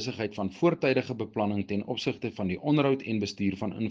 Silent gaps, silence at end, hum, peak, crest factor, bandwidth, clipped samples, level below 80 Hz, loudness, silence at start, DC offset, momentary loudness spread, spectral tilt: none; 0 s; none; -12 dBFS; 18 dB; 7.6 kHz; under 0.1%; -64 dBFS; -29 LUFS; 0 s; under 0.1%; 8 LU; -6.5 dB/octave